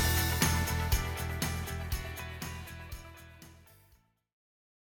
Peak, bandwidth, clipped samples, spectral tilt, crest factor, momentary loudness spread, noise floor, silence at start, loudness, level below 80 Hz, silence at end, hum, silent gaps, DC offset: -16 dBFS; over 20 kHz; under 0.1%; -3.5 dB/octave; 20 dB; 23 LU; -67 dBFS; 0 s; -33 LUFS; -40 dBFS; 1.35 s; none; none; under 0.1%